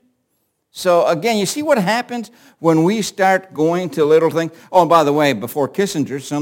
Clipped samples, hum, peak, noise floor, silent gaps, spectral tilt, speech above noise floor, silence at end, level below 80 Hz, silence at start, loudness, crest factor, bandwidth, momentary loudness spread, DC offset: under 0.1%; none; 0 dBFS; -69 dBFS; none; -5 dB/octave; 52 dB; 0 s; -64 dBFS; 0.75 s; -16 LUFS; 16 dB; 17 kHz; 9 LU; under 0.1%